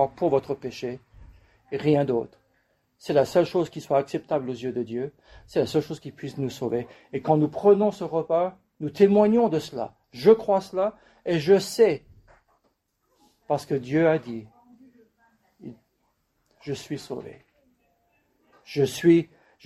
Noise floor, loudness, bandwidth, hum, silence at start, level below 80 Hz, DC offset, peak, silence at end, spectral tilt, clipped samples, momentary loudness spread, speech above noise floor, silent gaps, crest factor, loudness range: -72 dBFS; -24 LUFS; 13.5 kHz; none; 0 s; -62 dBFS; under 0.1%; -4 dBFS; 0.4 s; -6.5 dB/octave; under 0.1%; 17 LU; 48 dB; none; 20 dB; 14 LU